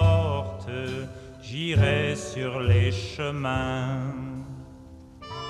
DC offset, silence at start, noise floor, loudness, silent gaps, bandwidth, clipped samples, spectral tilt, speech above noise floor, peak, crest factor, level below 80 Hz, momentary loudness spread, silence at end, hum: under 0.1%; 0 s; -46 dBFS; -27 LUFS; none; 9.8 kHz; under 0.1%; -6.5 dB/octave; 20 dB; -10 dBFS; 16 dB; -44 dBFS; 20 LU; 0 s; none